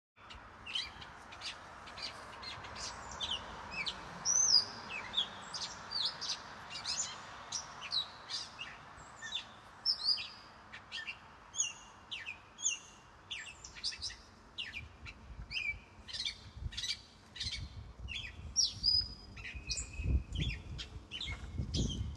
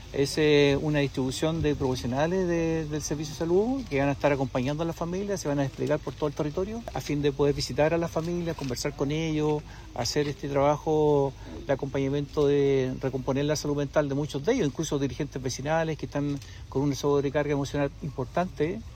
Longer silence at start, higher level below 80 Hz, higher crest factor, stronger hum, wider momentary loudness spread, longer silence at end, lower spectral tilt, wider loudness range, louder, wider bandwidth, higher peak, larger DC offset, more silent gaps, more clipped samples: first, 0.15 s vs 0 s; about the same, -50 dBFS vs -46 dBFS; first, 26 dB vs 16 dB; neither; first, 18 LU vs 7 LU; about the same, 0 s vs 0 s; second, -1 dB/octave vs -6 dB/octave; first, 9 LU vs 3 LU; second, -37 LUFS vs -27 LUFS; second, 12 kHz vs 16 kHz; second, -14 dBFS vs -10 dBFS; neither; neither; neither